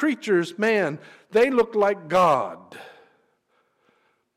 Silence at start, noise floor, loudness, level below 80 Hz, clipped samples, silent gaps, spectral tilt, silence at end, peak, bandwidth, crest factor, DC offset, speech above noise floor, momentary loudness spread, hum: 0 s; -68 dBFS; -22 LUFS; -64 dBFS; under 0.1%; none; -5.5 dB/octave; 1.5 s; -10 dBFS; 15.5 kHz; 14 dB; under 0.1%; 46 dB; 20 LU; none